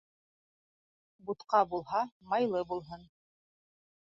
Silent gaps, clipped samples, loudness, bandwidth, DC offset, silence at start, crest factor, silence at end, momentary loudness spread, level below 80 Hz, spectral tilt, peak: 2.12-2.20 s; under 0.1%; -33 LUFS; 7.4 kHz; under 0.1%; 1.25 s; 22 dB; 1.15 s; 19 LU; -72 dBFS; -4 dB/octave; -14 dBFS